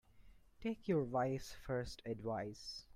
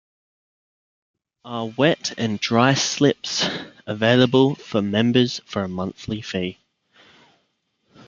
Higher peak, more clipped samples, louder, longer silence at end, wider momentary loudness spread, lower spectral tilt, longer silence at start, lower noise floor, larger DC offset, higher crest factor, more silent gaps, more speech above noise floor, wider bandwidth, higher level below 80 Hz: second, -24 dBFS vs -2 dBFS; neither; second, -42 LUFS vs -21 LUFS; second, 0 s vs 1.55 s; second, 9 LU vs 13 LU; first, -6 dB/octave vs -4.5 dB/octave; second, 0.15 s vs 1.45 s; second, -63 dBFS vs -70 dBFS; neither; about the same, 18 dB vs 20 dB; neither; second, 21 dB vs 50 dB; first, 16 kHz vs 7.6 kHz; about the same, -62 dBFS vs -60 dBFS